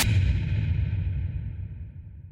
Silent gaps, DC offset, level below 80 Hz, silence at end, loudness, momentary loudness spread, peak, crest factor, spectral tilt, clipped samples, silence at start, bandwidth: none; under 0.1%; -32 dBFS; 0 s; -28 LUFS; 17 LU; -10 dBFS; 16 dB; -5 dB/octave; under 0.1%; 0 s; 15.5 kHz